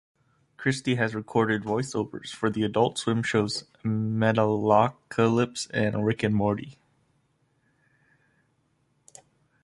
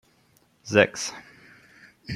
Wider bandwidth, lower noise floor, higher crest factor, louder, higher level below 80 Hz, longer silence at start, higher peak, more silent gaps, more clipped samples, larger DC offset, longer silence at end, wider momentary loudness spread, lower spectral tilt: second, 11.5 kHz vs 13 kHz; first, -70 dBFS vs -63 dBFS; about the same, 22 dB vs 26 dB; second, -26 LUFS vs -23 LUFS; first, -60 dBFS vs -66 dBFS; about the same, 0.6 s vs 0.65 s; second, -6 dBFS vs -2 dBFS; neither; neither; neither; first, 2.9 s vs 0 s; second, 8 LU vs 25 LU; first, -6 dB/octave vs -4 dB/octave